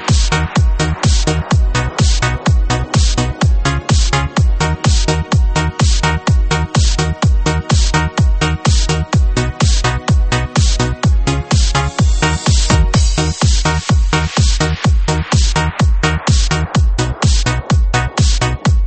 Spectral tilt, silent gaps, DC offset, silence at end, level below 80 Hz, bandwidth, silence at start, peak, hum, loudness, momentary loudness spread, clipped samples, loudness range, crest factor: -4.5 dB/octave; none; 0.2%; 0 s; -16 dBFS; 8.8 kHz; 0 s; 0 dBFS; none; -14 LUFS; 2 LU; under 0.1%; 1 LU; 12 dB